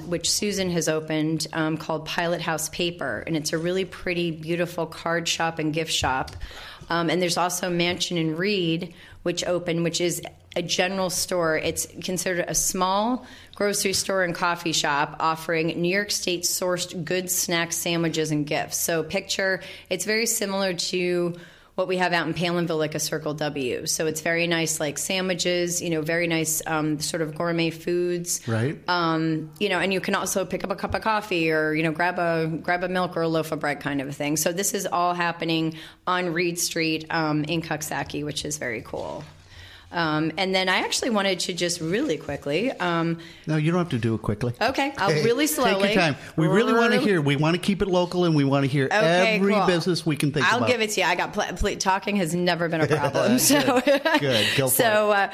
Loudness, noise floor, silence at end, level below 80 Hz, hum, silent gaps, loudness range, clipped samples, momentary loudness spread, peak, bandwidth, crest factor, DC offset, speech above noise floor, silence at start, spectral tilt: -24 LUFS; -46 dBFS; 0 s; -50 dBFS; none; none; 5 LU; under 0.1%; 8 LU; -6 dBFS; 15.5 kHz; 20 dB; under 0.1%; 22 dB; 0 s; -4 dB/octave